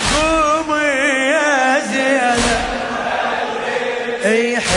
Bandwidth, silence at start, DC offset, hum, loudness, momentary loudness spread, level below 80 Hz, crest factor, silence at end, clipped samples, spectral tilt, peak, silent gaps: 11 kHz; 0 s; under 0.1%; none; -16 LUFS; 6 LU; -36 dBFS; 14 dB; 0 s; under 0.1%; -3 dB/octave; -2 dBFS; none